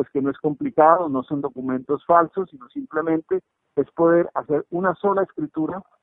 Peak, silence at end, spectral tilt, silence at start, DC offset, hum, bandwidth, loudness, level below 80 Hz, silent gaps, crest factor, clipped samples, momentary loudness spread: 0 dBFS; 0.2 s; -12 dB/octave; 0 s; under 0.1%; none; 3.9 kHz; -22 LUFS; -64 dBFS; none; 22 dB; under 0.1%; 11 LU